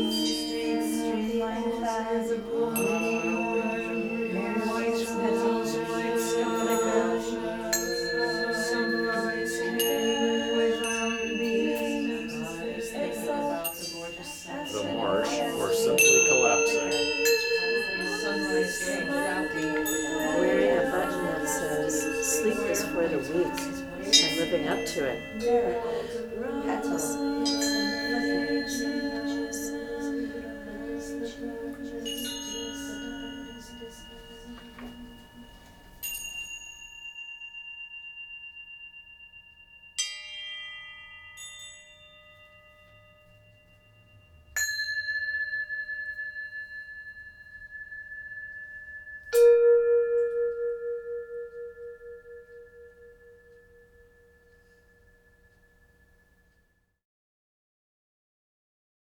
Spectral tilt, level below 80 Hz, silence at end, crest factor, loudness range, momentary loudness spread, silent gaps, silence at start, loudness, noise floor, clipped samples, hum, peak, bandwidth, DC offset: -2.5 dB/octave; -56 dBFS; 5.55 s; 24 dB; 15 LU; 18 LU; none; 0 s; -27 LUFS; -69 dBFS; under 0.1%; none; -6 dBFS; over 20 kHz; under 0.1%